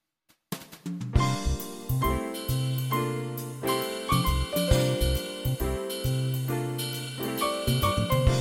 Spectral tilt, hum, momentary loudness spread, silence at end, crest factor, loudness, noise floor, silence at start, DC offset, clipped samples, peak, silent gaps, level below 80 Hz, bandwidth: -5 dB/octave; none; 9 LU; 0 s; 20 dB; -28 LUFS; -69 dBFS; 0.5 s; under 0.1%; under 0.1%; -8 dBFS; none; -36 dBFS; 17 kHz